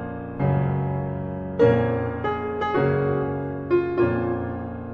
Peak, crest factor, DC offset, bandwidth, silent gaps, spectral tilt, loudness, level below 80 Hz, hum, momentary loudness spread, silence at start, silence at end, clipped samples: -6 dBFS; 18 dB; under 0.1%; 5 kHz; none; -10 dB/octave; -24 LUFS; -46 dBFS; none; 10 LU; 0 s; 0 s; under 0.1%